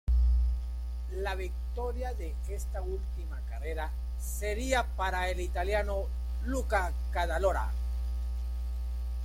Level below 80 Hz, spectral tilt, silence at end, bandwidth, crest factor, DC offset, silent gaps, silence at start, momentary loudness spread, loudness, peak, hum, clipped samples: -32 dBFS; -5.5 dB/octave; 0 s; 15 kHz; 16 dB; under 0.1%; none; 0.05 s; 8 LU; -34 LUFS; -14 dBFS; none; under 0.1%